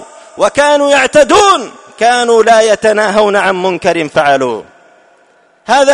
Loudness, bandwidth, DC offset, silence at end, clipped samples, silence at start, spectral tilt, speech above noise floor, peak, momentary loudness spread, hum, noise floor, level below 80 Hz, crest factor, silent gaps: -9 LUFS; 11 kHz; under 0.1%; 0 s; 0.5%; 0 s; -3 dB/octave; 40 dB; 0 dBFS; 7 LU; none; -48 dBFS; -46 dBFS; 10 dB; none